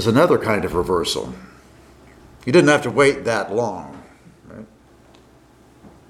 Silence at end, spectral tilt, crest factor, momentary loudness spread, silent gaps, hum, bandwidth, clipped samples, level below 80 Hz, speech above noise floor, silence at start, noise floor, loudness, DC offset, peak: 0.2 s; -5 dB/octave; 20 dB; 24 LU; none; none; 15 kHz; under 0.1%; -48 dBFS; 33 dB; 0 s; -50 dBFS; -18 LUFS; under 0.1%; -2 dBFS